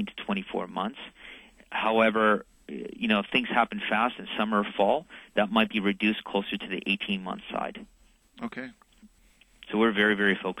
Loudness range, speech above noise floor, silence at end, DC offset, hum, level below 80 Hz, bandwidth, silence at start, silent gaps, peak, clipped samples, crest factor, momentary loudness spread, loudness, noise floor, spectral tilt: 7 LU; 33 dB; 0 s; under 0.1%; none; -62 dBFS; 11.5 kHz; 0 s; none; -8 dBFS; under 0.1%; 20 dB; 17 LU; -27 LUFS; -60 dBFS; -6 dB/octave